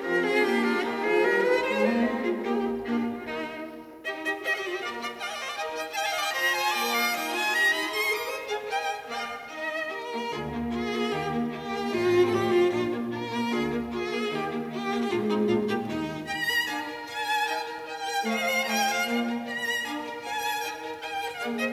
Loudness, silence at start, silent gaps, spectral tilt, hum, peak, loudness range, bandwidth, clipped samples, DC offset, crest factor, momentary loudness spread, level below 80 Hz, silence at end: -27 LUFS; 0 s; none; -3.5 dB/octave; none; -10 dBFS; 5 LU; 16 kHz; under 0.1%; under 0.1%; 18 dB; 10 LU; -60 dBFS; 0 s